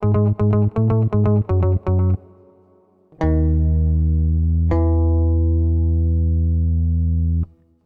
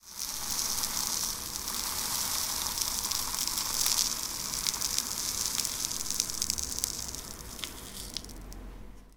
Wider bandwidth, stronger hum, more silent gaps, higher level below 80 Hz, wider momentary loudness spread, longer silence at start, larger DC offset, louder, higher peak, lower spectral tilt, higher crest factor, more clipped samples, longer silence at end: second, 2.6 kHz vs 19 kHz; neither; neither; first, -22 dBFS vs -50 dBFS; second, 3 LU vs 12 LU; about the same, 0 s vs 0.05 s; first, 0.1% vs under 0.1%; first, -19 LUFS vs -30 LUFS; second, -8 dBFS vs -4 dBFS; first, -12.5 dB/octave vs 0 dB/octave; second, 10 dB vs 30 dB; neither; first, 0.4 s vs 0 s